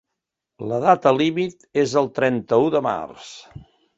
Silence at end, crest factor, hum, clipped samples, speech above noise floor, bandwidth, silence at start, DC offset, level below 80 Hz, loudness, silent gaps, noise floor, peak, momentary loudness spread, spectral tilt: 0.35 s; 20 dB; none; under 0.1%; 62 dB; 8 kHz; 0.6 s; under 0.1%; -60 dBFS; -20 LUFS; none; -82 dBFS; -2 dBFS; 18 LU; -6 dB/octave